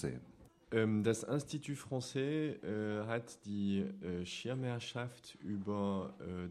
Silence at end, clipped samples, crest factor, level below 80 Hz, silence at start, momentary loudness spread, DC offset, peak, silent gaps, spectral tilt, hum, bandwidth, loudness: 0 s; under 0.1%; 18 dB; -70 dBFS; 0 s; 10 LU; under 0.1%; -20 dBFS; none; -6 dB/octave; none; 13 kHz; -39 LUFS